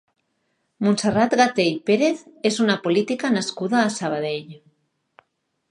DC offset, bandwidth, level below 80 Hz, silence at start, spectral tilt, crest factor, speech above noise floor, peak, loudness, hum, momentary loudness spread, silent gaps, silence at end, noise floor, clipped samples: under 0.1%; 11 kHz; -62 dBFS; 0.8 s; -4.5 dB/octave; 18 dB; 52 dB; -4 dBFS; -21 LUFS; none; 7 LU; none; 1.15 s; -73 dBFS; under 0.1%